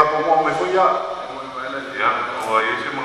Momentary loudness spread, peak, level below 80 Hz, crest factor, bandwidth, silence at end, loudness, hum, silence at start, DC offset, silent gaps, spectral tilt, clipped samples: 11 LU; 0 dBFS; -60 dBFS; 20 dB; 13.5 kHz; 0 s; -20 LUFS; none; 0 s; under 0.1%; none; -4 dB/octave; under 0.1%